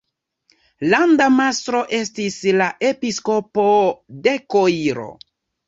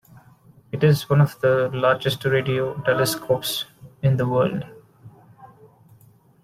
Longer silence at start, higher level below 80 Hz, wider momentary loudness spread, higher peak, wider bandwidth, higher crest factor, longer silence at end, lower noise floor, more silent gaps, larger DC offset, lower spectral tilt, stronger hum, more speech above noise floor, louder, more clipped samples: about the same, 0.8 s vs 0.75 s; second, -62 dBFS vs -56 dBFS; about the same, 9 LU vs 10 LU; first, 0 dBFS vs -4 dBFS; second, 8 kHz vs 15.5 kHz; about the same, 18 dB vs 18 dB; second, 0.55 s vs 0.95 s; first, -63 dBFS vs -53 dBFS; neither; neither; second, -4.5 dB/octave vs -6 dB/octave; neither; first, 46 dB vs 33 dB; first, -18 LUFS vs -21 LUFS; neither